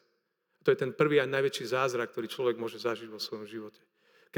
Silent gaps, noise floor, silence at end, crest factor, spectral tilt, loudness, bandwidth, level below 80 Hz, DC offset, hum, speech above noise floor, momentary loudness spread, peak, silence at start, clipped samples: none; -78 dBFS; 0 s; 20 dB; -5 dB/octave; -31 LUFS; 20 kHz; under -90 dBFS; under 0.1%; none; 47 dB; 14 LU; -12 dBFS; 0.65 s; under 0.1%